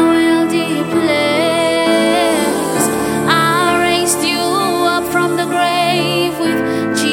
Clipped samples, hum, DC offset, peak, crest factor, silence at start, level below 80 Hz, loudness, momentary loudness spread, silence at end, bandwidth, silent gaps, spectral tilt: under 0.1%; none; under 0.1%; 0 dBFS; 14 dB; 0 s; -48 dBFS; -14 LUFS; 3 LU; 0 s; 17 kHz; none; -3.5 dB/octave